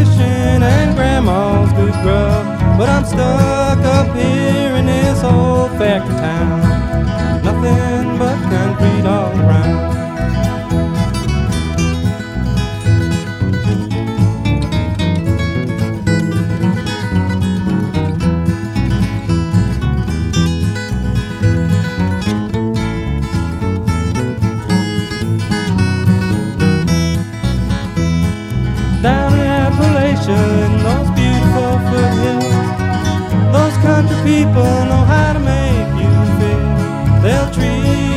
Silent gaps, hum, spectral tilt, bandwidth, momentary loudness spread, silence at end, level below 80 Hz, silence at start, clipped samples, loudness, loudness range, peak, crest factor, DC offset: none; none; -7 dB/octave; 13 kHz; 6 LU; 0 s; -24 dBFS; 0 s; under 0.1%; -14 LUFS; 4 LU; 0 dBFS; 12 dB; under 0.1%